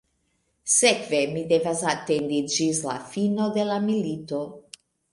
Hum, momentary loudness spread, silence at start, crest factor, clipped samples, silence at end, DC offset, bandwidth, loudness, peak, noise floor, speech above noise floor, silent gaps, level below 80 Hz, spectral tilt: none; 12 LU; 0.65 s; 20 dB; under 0.1%; 0.5 s; under 0.1%; 11.5 kHz; -24 LUFS; -4 dBFS; -71 dBFS; 47 dB; none; -66 dBFS; -3.5 dB/octave